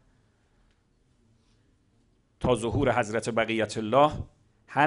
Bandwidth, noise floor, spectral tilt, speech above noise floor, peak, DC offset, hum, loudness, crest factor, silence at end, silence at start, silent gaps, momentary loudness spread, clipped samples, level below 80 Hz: 11 kHz; -67 dBFS; -5.5 dB/octave; 41 dB; -8 dBFS; under 0.1%; none; -26 LUFS; 20 dB; 0 s; 2.4 s; none; 9 LU; under 0.1%; -50 dBFS